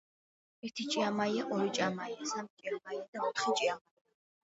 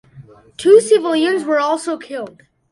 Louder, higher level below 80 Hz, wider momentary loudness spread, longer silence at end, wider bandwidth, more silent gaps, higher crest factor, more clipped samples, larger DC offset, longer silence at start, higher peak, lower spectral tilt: second, -35 LUFS vs -15 LUFS; second, -82 dBFS vs -62 dBFS; second, 10 LU vs 18 LU; first, 0.7 s vs 0.45 s; second, 8 kHz vs 11.5 kHz; first, 2.50-2.57 s, 3.08-3.13 s vs none; about the same, 18 dB vs 16 dB; neither; neither; first, 0.65 s vs 0.15 s; second, -18 dBFS vs 0 dBFS; about the same, -2.5 dB/octave vs -3.5 dB/octave